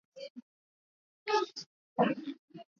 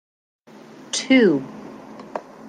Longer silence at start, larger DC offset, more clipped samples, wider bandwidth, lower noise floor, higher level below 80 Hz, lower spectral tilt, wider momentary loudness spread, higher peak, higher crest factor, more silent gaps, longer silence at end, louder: second, 0.15 s vs 0.95 s; neither; neither; second, 7.2 kHz vs 10 kHz; first, under -90 dBFS vs -44 dBFS; second, -86 dBFS vs -72 dBFS; about the same, -3.5 dB/octave vs -4 dB/octave; second, 18 LU vs 23 LU; second, -14 dBFS vs -4 dBFS; about the same, 22 dB vs 20 dB; first, 0.30-0.35 s, 0.42-1.26 s, 1.66-1.96 s, 2.39-2.48 s vs none; first, 0.15 s vs 0 s; second, -34 LUFS vs -18 LUFS